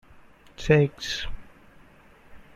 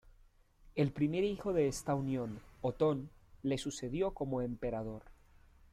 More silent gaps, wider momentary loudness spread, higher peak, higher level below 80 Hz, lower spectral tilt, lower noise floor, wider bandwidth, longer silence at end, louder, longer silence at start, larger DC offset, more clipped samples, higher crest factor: neither; first, 18 LU vs 9 LU; first, -6 dBFS vs -20 dBFS; first, -44 dBFS vs -56 dBFS; about the same, -6 dB/octave vs -6.5 dB/octave; second, -53 dBFS vs -65 dBFS; second, 12 kHz vs 14.5 kHz; second, 0.15 s vs 0.6 s; first, -24 LUFS vs -36 LUFS; second, 0.15 s vs 0.65 s; neither; neither; first, 22 dB vs 16 dB